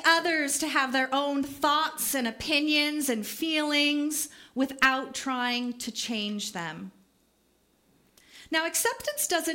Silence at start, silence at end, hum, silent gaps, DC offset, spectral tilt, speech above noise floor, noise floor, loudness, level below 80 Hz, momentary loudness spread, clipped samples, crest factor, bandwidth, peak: 0 s; 0 s; none; none; under 0.1%; -1.5 dB/octave; 39 dB; -68 dBFS; -27 LUFS; -64 dBFS; 9 LU; under 0.1%; 22 dB; 16.5 kHz; -8 dBFS